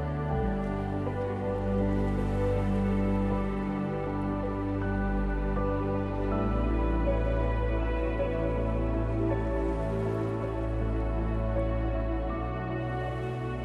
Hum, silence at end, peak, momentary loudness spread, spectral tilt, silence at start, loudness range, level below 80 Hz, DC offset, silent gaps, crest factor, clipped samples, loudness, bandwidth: none; 0 s; -16 dBFS; 4 LU; -9 dB/octave; 0 s; 2 LU; -34 dBFS; under 0.1%; none; 12 dB; under 0.1%; -30 LUFS; 5.4 kHz